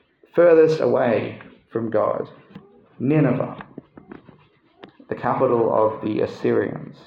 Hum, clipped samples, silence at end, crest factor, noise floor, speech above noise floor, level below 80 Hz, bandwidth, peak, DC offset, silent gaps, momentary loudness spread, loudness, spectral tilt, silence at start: none; under 0.1%; 0.15 s; 16 dB; -55 dBFS; 36 dB; -64 dBFS; 7 kHz; -4 dBFS; under 0.1%; none; 17 LU; -20 LUFS; -8.5 dB/octave; 0.35 s